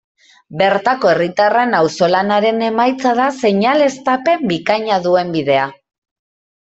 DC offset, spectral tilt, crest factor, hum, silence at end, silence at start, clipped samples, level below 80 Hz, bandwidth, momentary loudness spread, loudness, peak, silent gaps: under 0.1%; -5.5 dB/octave; 14 dB; none; 0.85 s; 0.5 s; under 0.1%; -58 dBFS; 8.2 kHz; 3 LU; -15 LUFS; 0 dBFS; none